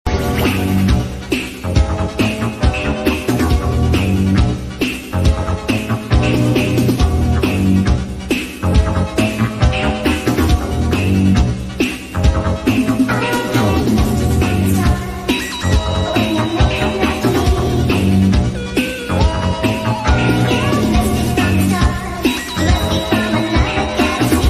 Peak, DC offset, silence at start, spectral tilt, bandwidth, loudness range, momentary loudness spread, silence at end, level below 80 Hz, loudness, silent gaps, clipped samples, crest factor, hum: 0 dBFS; under 0.1%; 0.05 s; -6 dB/octave; 15 kHz; 1 LU; 5 LU; 0 s; -22 dBFS; -16 LUFS; none; under 0.1%; 14 dB; none